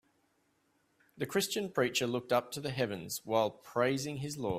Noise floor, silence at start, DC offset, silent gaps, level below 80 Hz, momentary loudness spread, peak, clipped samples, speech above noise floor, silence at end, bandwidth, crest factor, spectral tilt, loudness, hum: -75 dBFS; 1.15 s; under 0.1%; none; -68 dBFS; 7 LU; -14 dBFS; under 0.1%; 41 dB; 0 s; 16 kHz; 20 dB; -4 dB/octave; -34 LUFS; none